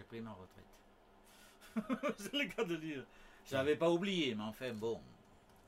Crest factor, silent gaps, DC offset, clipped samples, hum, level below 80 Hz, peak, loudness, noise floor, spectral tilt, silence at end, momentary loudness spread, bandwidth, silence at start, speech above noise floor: 18 dB; none; under 0.1%; under 0.1%; none; -68 dBFS; -22 dBFS; -39 LUFS; -64 dBFS; -5 dB/octave; 0.5 s; 21 LU; 16 kHz; 0 s; 25 dB